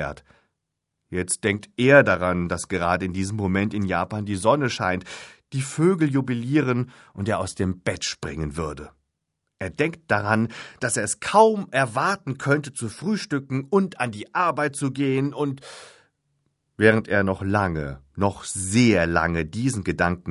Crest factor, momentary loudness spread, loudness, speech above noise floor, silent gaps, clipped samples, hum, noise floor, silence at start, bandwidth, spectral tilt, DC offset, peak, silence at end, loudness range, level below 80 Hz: 22 dB; 13 LU; -23 LUFS; 57 dB; none; under 0.1%; none; -80 dBFS; 0 s; 11.5 kHz; -5.5 dB/octave; under 0.1%; -2 dBFS; 0 s; 5 LU; -44 dBFS